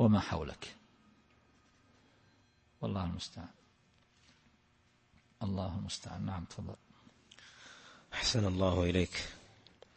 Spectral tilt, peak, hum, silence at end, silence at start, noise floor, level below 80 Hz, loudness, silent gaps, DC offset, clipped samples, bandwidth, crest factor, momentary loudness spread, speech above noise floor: -5.5 dB/octave; -16 dBFS; none; 0.55 s; 0 s; -70 dBFS; -56 dBFS; -36 LUFS; none; under 0.1%; under 0.1%; 8.4 kHz; 22 dB; 23 LU; 35 dB